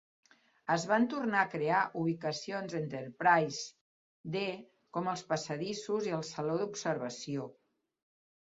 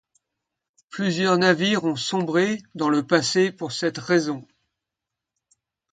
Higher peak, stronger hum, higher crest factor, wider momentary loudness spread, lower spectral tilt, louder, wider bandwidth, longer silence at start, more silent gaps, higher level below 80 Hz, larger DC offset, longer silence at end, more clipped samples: second, -12 dBFS vs -4 dBFS; neither; about the same, 22 dB vs 20 dB; first, 11 LU vs 8 LU; about the same, -4 dB/octave vs -4.5 dB/octave; second, -34 LUFS vs -22 LUFS; second, 7.6 kHz vs 9.4 kHz; second, 0.65 s vs 0.9 s; first, 3.81-4.24 s vs none; second, -78 dBFS vs -68 dBFS; neither; second, 0.95 s vs 1.5 s; neither